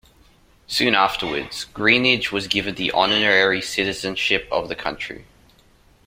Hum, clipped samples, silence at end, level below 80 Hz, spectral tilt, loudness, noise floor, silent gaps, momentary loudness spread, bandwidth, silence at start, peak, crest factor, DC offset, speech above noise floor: none; under 0.1%; 0.85 s; -50 dBFS; -3 dB/octave; -19 LUFS; -55 dBFS; none; 12 LU; 16 kHz; 0.7 s; -2 dBFS; 20 dB; under 0.1%; 34 dB